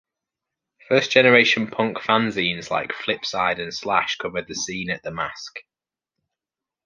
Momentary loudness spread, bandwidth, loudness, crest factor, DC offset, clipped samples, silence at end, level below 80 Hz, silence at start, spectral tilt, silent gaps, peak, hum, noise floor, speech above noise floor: 14 LU; 7.4 kHz; -21 LUFS; 22 dB; under 0.1%; under 0.1%; 1.25 s; -60 dBFS; 0.9 s; -3.5 dB/octave; none; -2 dBFS; none; -90 dBFS; 68 dB